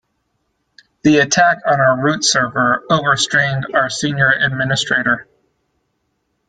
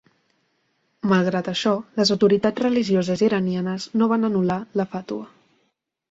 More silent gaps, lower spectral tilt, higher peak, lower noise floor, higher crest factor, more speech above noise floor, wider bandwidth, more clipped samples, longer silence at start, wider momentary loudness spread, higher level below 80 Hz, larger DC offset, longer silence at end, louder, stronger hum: neither; second, -3.5 dB/octave vs -6 dB/octave; first, 0 dBFS vs -6 dBFS; about the same, -68 dBFS vs -71 dBFS; about the same, 16 dB vs 18 dB; about the same, 53 dB vs 50 dB; first, 9.4 kHz vs 7.8 kHz; neither; about the same, 1.05 s vs 1.05 s; second, 5 LU vs 9 LU; first, -54 dBFS vs -60 dBFS; neither; first, 1.25 s vs 0.85 s; first, -15 LUFS vs -21 LUFS; neither